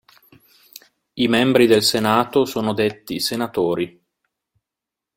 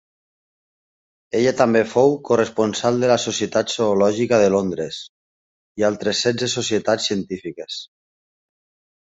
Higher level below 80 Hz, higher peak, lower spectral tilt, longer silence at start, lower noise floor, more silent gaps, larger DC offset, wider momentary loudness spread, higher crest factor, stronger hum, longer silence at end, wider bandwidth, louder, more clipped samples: about the same, -60 dBFS vs -58 dBFS; about the same, -2 dBFS vs -2 dBFS; about the same, -4.5 dB/octave vs -4.5 dB/octave; second, 1.15 s vs 1.35 s; second, -86 dBFS vs under -90 dBFS; second, none vs 5.09-5.75 s; neither; second, 10 LU vs 13 LU; about the same, 20 dB vs 18 dB; neither; about the same, 1.3 s vs 1.2 s; first, 16.5 kHz vs 8 kHz; about the same, -18 LUFS vs -19 LUFS; neither